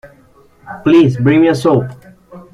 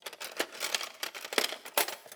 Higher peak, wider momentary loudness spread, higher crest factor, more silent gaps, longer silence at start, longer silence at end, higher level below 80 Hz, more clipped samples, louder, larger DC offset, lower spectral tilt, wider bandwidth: first, -2 dBFS vs -10 dBFS; first, 15 LU vs 7 LU; second, 12 dB vs 26 dB; neither; about the same, 0.05 s vs 0.05 s; first, 0.15 s vs 0 s; first, -48 dBFS vs -90 dBFS; neither; first, -11 LUFS vs -33 LUFS; neither; first, -8 dB/octave vs 1 dB/octave; second, 11.5 kHz vs over 20 kHz